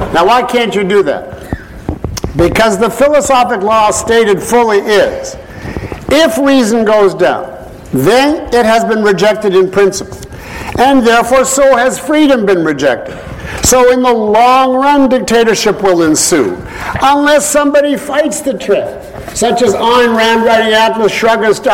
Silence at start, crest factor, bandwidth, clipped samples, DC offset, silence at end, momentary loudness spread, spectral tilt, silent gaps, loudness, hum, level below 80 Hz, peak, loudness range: 0 s; 10 dB; 16.5 kHz; under 0.1%; under 0.1%; 0 s; 14 LU; -3.5 dB/octave; none; -9 LUFS; none; -32 dBFS; 0 dBFS; 2 LU